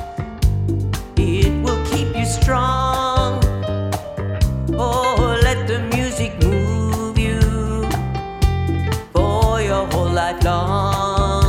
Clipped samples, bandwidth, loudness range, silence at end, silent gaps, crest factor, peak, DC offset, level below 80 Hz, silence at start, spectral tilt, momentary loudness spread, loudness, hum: under 0.1%; 16 kHz; 1 LU; 0 s; none; 16 dB; -2 dBFS; under 0.1%; -24 dBFS; 0 s; -6 dB/octave; 5 LU; -19 LUFS; none